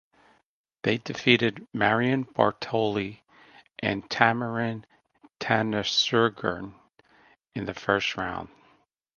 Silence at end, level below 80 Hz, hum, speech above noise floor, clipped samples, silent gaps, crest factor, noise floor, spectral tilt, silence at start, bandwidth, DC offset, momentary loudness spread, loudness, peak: 0.7 s; -60 dBFS; none; 45 dB; under 0.1%; none; 28 dB; -71 dBFS; -5 dB/octave; 0.85 s; 7.2 kHz; under 0.1%; 15 LU; -26 LUFS; 0 dBFS